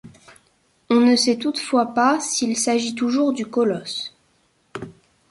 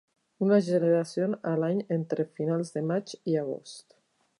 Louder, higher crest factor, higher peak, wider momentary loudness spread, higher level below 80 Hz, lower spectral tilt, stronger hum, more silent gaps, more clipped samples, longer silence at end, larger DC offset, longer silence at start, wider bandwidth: first, -20 LUFS vs -28 LUFS; about the same, 16 dB vs 18 dB; first, -6 dBFS vs -10 dBFS; first, 20 LU vs 9 LU; first, -64 dBFS vs -80 dBFS; second, -3 dB/octave vs -7.5 dB/octave; neither; neither; neither; second, 0.4 s vs 0.6 s; neither; second, 0.05 s vs 0.4 s; about the same, 11.5 kHz vs 11.5 kHz